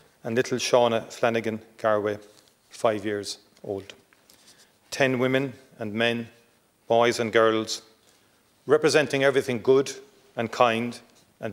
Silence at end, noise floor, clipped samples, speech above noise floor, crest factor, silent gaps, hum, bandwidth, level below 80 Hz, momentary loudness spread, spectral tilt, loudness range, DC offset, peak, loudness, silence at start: 0 s; -62 dBFS; under 0.1%; 38 dB; 20 dB; none; none; 16 kHz; -72 dBFS; 16 LU; -4.5 dB/octave; 6 LU; under 0.1%; -6 dBFS; -25 LUFS; 0.25 s